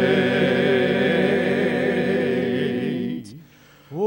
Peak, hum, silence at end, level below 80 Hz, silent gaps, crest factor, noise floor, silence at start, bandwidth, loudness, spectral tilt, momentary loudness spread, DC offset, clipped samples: -6 dBFS; none; 0 s; -66 dBFS; none; 16 dB; -50 dBFS; 0 s; 16 kHz; -21 LUFS; -7 dB/octave; 8 LU; under 0.1%; under 0.1%